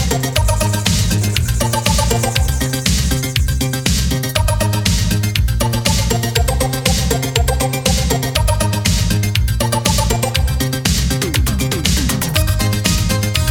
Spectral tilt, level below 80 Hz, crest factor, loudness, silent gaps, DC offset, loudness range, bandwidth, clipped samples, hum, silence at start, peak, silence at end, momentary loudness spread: -4 dB/octave; -20 dBFS; 14 dB; -16 LUFS; none; 0.2%; 0 LU; 20 kHz; under 0.1%; none; 0 s; 0 dBFS; 0 s; 2 LU